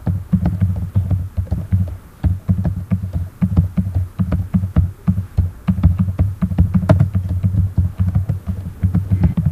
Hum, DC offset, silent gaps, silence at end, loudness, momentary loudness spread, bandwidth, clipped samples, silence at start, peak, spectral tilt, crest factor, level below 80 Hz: none; under 0.1%; none; 0 s; -19 LUFS; 6 LU; 4.1 kHz; under 0.1%; 0 s; 0 dBFS; -10 dB/octave; 18 dB; -26 dBFS